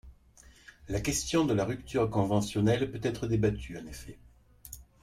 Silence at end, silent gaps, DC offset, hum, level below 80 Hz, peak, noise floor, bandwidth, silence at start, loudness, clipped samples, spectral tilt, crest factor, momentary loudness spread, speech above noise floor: 0.2 s; none; under 0.1%; none; -48 dBFS; -14 dBFS; -57 dBFS; 16 kHz; 0.05 s; -30 LUFS; under 0.1%; -5.5 dB/octave; 18 dB; 19 LU; 28 dB